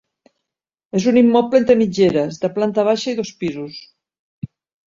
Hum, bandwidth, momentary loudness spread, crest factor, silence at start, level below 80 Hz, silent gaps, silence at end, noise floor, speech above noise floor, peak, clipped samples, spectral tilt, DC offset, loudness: none; 7.6 kHz; 22 LU; 16 dB; 0.95 s; -56 dBFS; 4.19-4.42 s; 0.4 s; -85 dBFS; 69 dB; -2 dBFS; under 0.1%; -6 dB/octave; under 0.1%; -17 LUFS